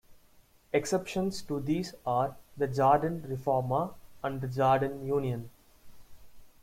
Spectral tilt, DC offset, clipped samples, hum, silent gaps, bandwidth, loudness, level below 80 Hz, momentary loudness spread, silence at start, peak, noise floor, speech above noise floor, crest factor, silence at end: -6.5 dB/octave; under 0.1%; under 0.1%; none; none; 16.5 kHz; -31 LUFS; -60 dBFS; 10 LU; 0.1 s; -12 dBFS; -61 dBFS; 32 dB; 20 dB; 0.1 s